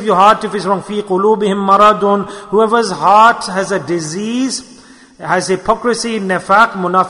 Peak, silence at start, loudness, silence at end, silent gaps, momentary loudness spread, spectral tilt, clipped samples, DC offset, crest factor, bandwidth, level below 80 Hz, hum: 0 dBFS; 0 s; -13 LUFS; 0 s; none; 9 LU; -4.5 dB/octave; 0.2%; under 0.1%; 12 dB; 11 kHz; -50 dBFS; none